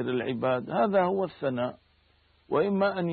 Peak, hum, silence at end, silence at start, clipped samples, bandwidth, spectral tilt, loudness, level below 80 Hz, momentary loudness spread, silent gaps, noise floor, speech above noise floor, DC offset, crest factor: -12 dBFS; none; 0 s; 0 s; under 0.1%; 4.7 kHz; -11 dB/octave; -28 LUFS; -68 dBFS; 6 LU; none; -65 dBFS; 38 dB; under 0.1%; 16 dB